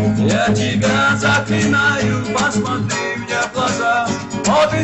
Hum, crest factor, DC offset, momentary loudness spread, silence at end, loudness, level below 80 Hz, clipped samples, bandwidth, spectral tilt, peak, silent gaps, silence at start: none; 12 dB; under 0.1%; 6 LU; 0 s; -16 LUFS; -44 dBFS; under 0.1%; 8.6 kHz; -4.5 dB/octave; -4 dBFS; none; 0 s